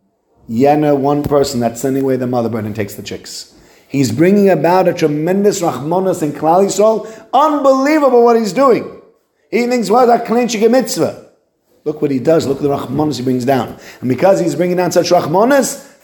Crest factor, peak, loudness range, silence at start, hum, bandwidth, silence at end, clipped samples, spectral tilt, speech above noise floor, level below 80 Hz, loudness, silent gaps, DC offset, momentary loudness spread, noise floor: 14 dB; 0 dBFS; 4 LU; 0.5 s; none; 17.5 kHz; 0.2 s; under 0.1%; -5.5 dB/octave; 44 dB; -50 dBFS; -13 LUFS; none; under 0.1%; 11 LU; -57 dBFS